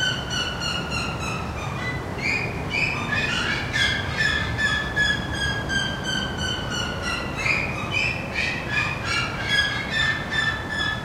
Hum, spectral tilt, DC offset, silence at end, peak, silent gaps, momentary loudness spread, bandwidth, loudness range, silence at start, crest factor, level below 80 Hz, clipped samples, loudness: none; -3.5 dB/octave; under 0.1%; 0 s; -8 dBFS; none; 5 LU; 16 kHz; 2 LU; 0 s; 16 dB; -38 dBFS; under 0.1%; -23 LUFS